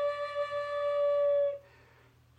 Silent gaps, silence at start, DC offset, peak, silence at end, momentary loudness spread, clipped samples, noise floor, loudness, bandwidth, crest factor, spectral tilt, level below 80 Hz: none; 0 s; under 0.1%; -22 dBFS; 0.8 s; 7 LU; under 0.1%; -62 dBFS; -31 LUFS; 8 kHz; 10 dB; -3.5 dB/octave; -70 dBFS